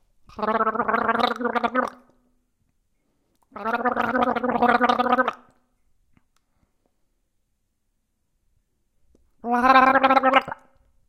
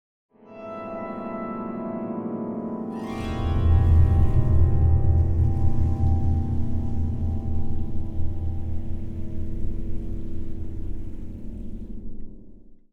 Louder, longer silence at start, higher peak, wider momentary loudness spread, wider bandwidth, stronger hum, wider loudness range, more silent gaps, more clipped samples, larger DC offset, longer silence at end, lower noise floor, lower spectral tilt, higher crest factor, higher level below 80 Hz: first, -21 LUFS vs -26 LUFS; second, 0.35 s vs 0.5 s; first, -2 dBFS vs -6 dBFS; second, 13 LU vs 18 LU; first, 14.5 kHz vs 3.9 kHz; neither; second, 6 LU vs 13 LU; neither; neither; neither; first, 0.55 s vs 0.2 s; first, -73 dBFS vs -44 dBFS; second, -5 dB/octave vs -10 dB/octave; first, 24 dB vs 16 dB; second, -58 dBFS vs -30 dBFS